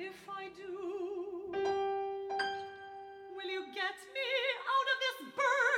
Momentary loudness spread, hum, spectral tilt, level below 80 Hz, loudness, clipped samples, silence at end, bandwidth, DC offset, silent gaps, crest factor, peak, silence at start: 13 LU; none; -2 dB/octave; -78 dBFS; -36 LUFS; under 0.1%; 0 s; 16.5 kHz; under 0.1%; none; 16 dB; -20 dBFS; 0 s